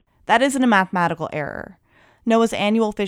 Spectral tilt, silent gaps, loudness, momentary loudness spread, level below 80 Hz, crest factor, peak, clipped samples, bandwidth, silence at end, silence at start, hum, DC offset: -5 dB/octave; none; -19 LUFS; 13 LU; -54 dBFS; 18 dB; -2 dBFS; under 0.1%; 15.5 kHz; 0 s; 0.3 s; none; under 0.1%